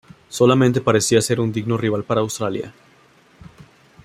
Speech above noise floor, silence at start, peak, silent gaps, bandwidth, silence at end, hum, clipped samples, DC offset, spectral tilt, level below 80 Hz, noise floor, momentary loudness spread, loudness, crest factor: 35 dB; 0.3 s; -2 dBFS; none; 15.5 kHz; 1.35 s; none; under 0.1%; under 0.1%; -5 dB/octave; -56 dBFS; -53 dBFS; 12 LU; -19 LUFS; 18 dB